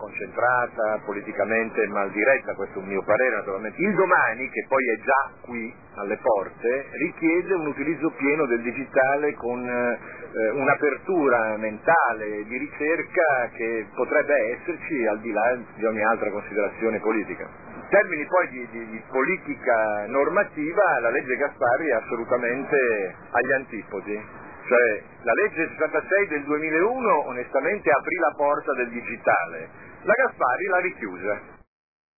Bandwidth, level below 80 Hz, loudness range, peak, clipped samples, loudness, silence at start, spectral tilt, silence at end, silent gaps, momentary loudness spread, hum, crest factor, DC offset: 2.7 kHz; -64 dBFS; 2 LU; -6 dBFS; under 0.1%; -24 LUFS; 0 s; -13 dB/octave; 0.6 s; none; 10 LU; none; 18 dB; 0.2%